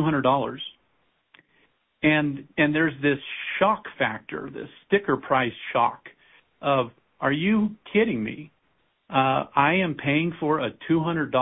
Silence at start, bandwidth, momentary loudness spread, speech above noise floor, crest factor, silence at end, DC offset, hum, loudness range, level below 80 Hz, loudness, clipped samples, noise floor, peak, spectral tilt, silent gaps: 0 s; 4 kHz; 12 LU; 45 dB; 20 dB; 0 s; under 0.1%; none; 2 LU; -60 dBFS; -24 LUFS; under 0.1%; -69 dBFS; -6 dBFS; -10.5 dB/octave; none